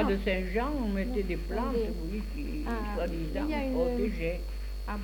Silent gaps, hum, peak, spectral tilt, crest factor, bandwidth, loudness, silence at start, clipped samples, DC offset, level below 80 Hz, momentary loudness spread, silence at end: none; none; -16 dBFS; -7 dB/octave; 16 dB; 19 kHz; -32 LUFS; 0 s; under 0.1%; under 0.1%; -36 dBFS; 7 LU; 0 s